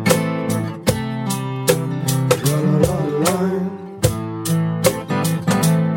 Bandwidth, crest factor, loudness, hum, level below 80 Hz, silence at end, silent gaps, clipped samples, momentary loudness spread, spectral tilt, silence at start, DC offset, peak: 17 kHz; 18 dB; -19 LUFS; none; -42 dBFS; 0 s; none; under 0.1%; 6 LU; -5.5 dB/octave; 0 s; under 0.1%; 0 dBFS